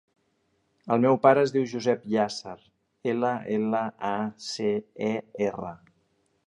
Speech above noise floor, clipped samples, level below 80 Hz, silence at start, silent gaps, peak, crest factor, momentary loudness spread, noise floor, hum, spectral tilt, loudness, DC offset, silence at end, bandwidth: 46 dB; under 0.1%; -70 dBFS; 0.85 s; none; -4 dBFS; 22 dB; 14 LU; -71 dBFS; none; -6 dB/octave; -26 LUFS; under 0.1%; 0.7 s; 10.5 kHz